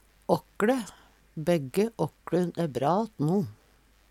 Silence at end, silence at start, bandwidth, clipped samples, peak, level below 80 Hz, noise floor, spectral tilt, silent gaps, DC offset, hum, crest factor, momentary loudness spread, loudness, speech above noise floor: 0.6 s; 0.3 s; 16 kHz; under 0.1%; -8 dBFS; -62 dBFS; -61 dBFS; -7 dB/octave; none; under 0.1%; none; 20 dB; 7 LU; -29 LUFS; 34 dB